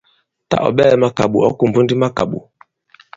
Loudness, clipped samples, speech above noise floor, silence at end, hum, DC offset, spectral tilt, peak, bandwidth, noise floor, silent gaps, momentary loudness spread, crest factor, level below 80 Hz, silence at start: -15 LUFS; under 0.1%; 37 dB; 0.75 s; none; under 0.1%; -7 dB/octave; 0 dBFS; 7.8 kHz; -51 dBFS; none; 9 LU; 16 dB; -48 dBFS; 0.5 s